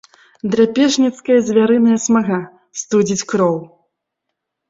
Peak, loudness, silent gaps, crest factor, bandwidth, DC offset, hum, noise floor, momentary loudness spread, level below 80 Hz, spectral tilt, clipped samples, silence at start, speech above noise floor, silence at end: -2 dBFS; -15 LUFS; none; 14 dB; 7.8 kHz; under 0.1%; none; -77 dBFS; 12 LU; -58 dBFS; -5 dB/octave; under 0.1%; 0.45 s; 63 dB; 1.05 s